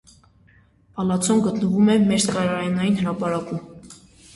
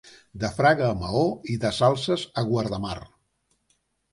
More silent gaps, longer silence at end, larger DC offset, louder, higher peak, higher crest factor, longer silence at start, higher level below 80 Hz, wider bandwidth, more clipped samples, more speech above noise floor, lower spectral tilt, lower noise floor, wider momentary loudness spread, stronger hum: neither; second, 0.4 s vs 1.05 s; neither; first, -21 LUFS vs -24 LUFS; about the same, -8 dBFS vs -6 dBFS; second, 14 dB vs 20 dB; first, 0.95 s vs 0.05 s; second, -56 dBFS vs -50 dBFS; about the same, 11.5 kHz vs 11.5 kHz; neither; second, 35 dB vs 48 dB; about the same, -5.5 dB/octave vs -6 dB/octave; second, -55 dBFS vs -72 dBFS; first, 15 LU vs 11 LU; neither